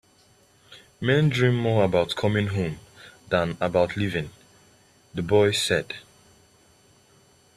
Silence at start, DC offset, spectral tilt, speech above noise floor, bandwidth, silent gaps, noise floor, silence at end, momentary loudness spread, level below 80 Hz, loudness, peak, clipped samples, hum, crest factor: 0.7 s; under 0.1%; -5.5 dB/octave; 36 dB; 14 kHz; none; -59 dBFS; 1.55 s; 15 LU; -56 dBFS; -24 LUFS; -6 dBFS; under 0.1%; none; 20 dB